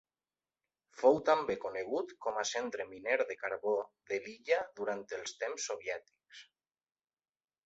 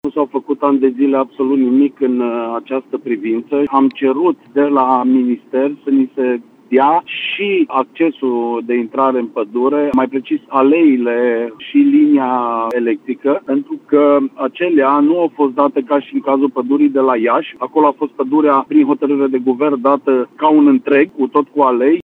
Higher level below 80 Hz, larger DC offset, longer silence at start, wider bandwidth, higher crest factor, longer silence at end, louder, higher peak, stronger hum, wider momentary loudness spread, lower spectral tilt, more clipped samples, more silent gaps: second, -76 dBFS vs -62 dBFS; neither; first, 0.95 s vs 0.05 s; first, 8 kHz vs 4.1 kHz; first, 22 dB vs 14 dB; first, 1.25 s vs 0.05 s; second, -35 LUFS vs -14 LUFS; second, -14 dBFS vs 0 dBFS; neither; first, 11 LU vs 7 LU; second, -1.5 dB/octave vs -8 dB/octave; neither; neither